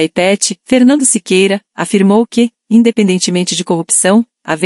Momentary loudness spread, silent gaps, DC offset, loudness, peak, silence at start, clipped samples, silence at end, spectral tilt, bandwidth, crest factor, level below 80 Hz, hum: 6 LU; none; under 0.1%; -11 LUFS; 0 dBFS; 0 s; under 0.1%; 0 s; -4 dB/octave; 12 kHz; 12 dB; -58 dBFS; none